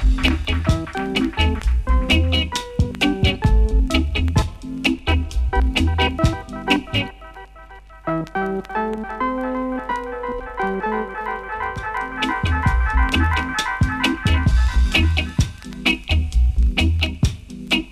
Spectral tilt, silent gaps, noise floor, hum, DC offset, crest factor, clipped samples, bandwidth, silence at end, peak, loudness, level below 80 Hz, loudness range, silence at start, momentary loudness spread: -5.5 dB/octave; none; -41 dBFS; none; under 0.1%; 16 dB; under 0.1%; 13.5 kHz; 0 s; -4 dBFS; -21 LUFS; -22 dBFS; 6 LU; 0 s; 8 LU